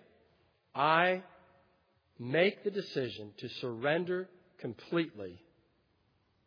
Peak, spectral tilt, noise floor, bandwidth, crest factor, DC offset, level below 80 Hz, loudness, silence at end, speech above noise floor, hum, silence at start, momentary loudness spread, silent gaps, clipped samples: -12 dBFS; -7 dB/octave; -73 dBFS; 5.2 kHz; 24 dB; under 0.1%; -80 dBFS; -33 LUFS; 1.1 s; 40 dB; none; 0.75 s; 17 LU; none; under 0.1%